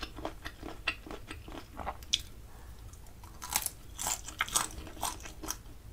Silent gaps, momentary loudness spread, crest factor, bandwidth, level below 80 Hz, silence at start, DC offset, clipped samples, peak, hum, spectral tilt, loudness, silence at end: none; 19 LU; 32 dB; 16 kHz; -50 dBFS; 0 s; under 0.1%; under 0.1%; -8 dBFS; none; -1 dB/octave; -36 LUFS; 0 s